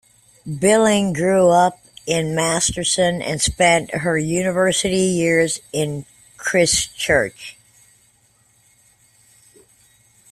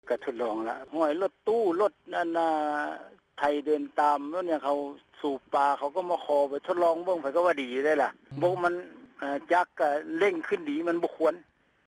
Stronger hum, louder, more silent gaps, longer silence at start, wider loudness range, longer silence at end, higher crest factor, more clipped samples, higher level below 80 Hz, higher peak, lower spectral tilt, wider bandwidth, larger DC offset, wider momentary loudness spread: neither; first, -18 LUFS vs -28 LUFS; neither; first, 0.45 s vs 0.05 s; first, 5 LU vs 2 LU; first, 2.8 s vs 0.45 s; about the same, 18 dB vs 16 dB; neither; first, -46 dBFS vs -74 dBFS; first, -2 dBFS vs -12 dBFS; second, -3.5 dB/octave vs -5.5 dB/octave; first, 15 kHz vs 12 kHz; neither; first, 12 LU vs 8 LU